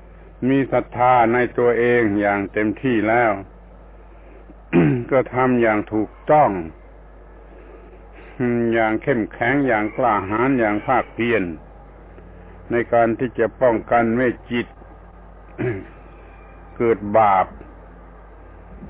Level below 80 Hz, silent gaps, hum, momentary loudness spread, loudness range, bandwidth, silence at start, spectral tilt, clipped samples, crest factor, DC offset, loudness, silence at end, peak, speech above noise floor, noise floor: -44 dBFS; none; none; 10 LU; 4 LU; 4 kHz; 0.2 s; -10.5 dB/octave; under 0.1%; 16 dB; under 0.1%; -19 LUFS; 0 s; -4 dBFS; 24 dB; -42 dBFS